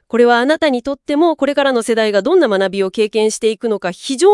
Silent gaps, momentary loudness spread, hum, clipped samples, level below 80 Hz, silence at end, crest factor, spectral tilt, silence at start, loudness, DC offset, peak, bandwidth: none; 7 LU; none; under 0.1%; -56 dBFS; 0 s; 14 dB; -4 dB/octave; 0.15 s; -15 LUFS; under 0.1%; 0 dBFS; 12 kHz